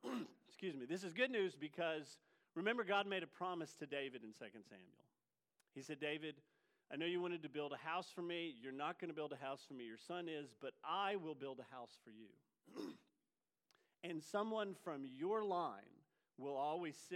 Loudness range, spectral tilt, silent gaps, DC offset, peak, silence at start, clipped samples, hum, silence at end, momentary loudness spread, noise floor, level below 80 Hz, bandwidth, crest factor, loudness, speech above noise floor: 7 LU; -5 dB/octave; none; under 0.1%; -26 dBFS; 0.05 s; under 0.1%; none; 0 s; 16 LU; under -90 dBFS; under -90 dBFS; 15 kHz; 22 dB; -46 LUFS; over 44 dB